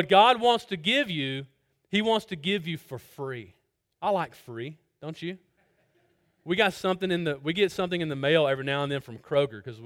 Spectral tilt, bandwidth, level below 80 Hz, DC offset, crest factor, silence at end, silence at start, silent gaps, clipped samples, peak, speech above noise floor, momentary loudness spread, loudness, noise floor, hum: -5.5 dB/octave; 17 kHz; -66 dBFS; under 0.1%; 20 dB; 0 s; 0 s; none; under 0.1%; -6 dBFS; 42 dB; 15 LU; -27 LUFS; -68 dBFS; none